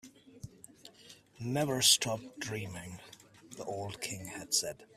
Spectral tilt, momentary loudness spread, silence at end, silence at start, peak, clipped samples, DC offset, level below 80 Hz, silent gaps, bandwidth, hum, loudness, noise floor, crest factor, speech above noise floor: -2 dB/octave; 27 LU; 0.1 s; 0.05 s; -10 dBFS; under 0.1%; under 0.1%; -68 dBFS; none; 15.5 kHz; none; -32 LUFS; -58 dBFS; 26 dB; 24 dB